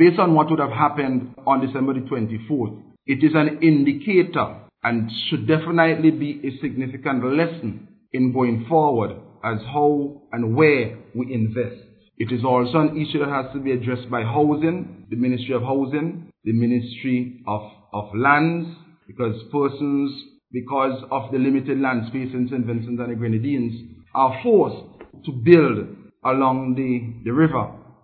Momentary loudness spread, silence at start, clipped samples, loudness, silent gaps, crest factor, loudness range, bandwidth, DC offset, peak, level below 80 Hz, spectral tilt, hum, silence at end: 13 LU; 0 s; under 0.1%; -21 LUFS; none; 20 dB; 4 LU; 4.6 kHz; under 0.1%; 0 dBFS; -60 dBFS; -11 dB/octave; none; 0.25 s